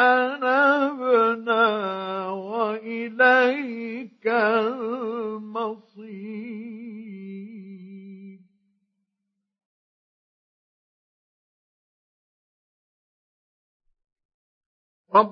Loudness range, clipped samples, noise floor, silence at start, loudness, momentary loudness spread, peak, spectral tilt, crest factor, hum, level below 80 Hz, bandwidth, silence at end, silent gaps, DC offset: 20 LU; under 0.1%; -81 dBFS; 0 s; -22 LUFS; 21 LU; -4 dBFS; -6.5 dB/octave; 22 dB; none; -88 dBFS; 6.2 kHz; 0 s; 9.65-13.80 s, 14.12-14.16 s, 14.25-15.05 s; under 0.1%